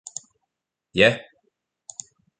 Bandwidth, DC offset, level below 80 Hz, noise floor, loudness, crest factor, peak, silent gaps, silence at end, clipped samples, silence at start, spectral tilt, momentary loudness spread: 9.6 kHz; under 0.1%; -58 dBFS; -82 dBFS; -20 LUFS; 26 dB; -2 dBFS; none; 1.2 s; under 0.1%; 0.95 s; -3.5 dB/octave; 21 LU